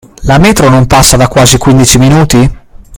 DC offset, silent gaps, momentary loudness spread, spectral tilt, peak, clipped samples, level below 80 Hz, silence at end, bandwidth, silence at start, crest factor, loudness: under 0.1%; none; 4 LU; -4.5 dB/octave; 0 dBFS; 8%; -20 dBFS; 0 s; over 20 kHz; 0.2 s; 6 dB; -5 LUFS